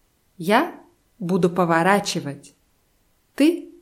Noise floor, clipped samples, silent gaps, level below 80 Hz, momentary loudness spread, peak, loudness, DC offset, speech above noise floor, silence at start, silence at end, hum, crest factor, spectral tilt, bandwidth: -64 dBFS; under 0.1%; none; -64 dBFS; 14 LU; -4 dBFS; -21 LUFS; under 0.1%; 44 dB; 0.4 s; 0.15 s; none; 20 dB; -5.5 dB/octave; 16.5 kHz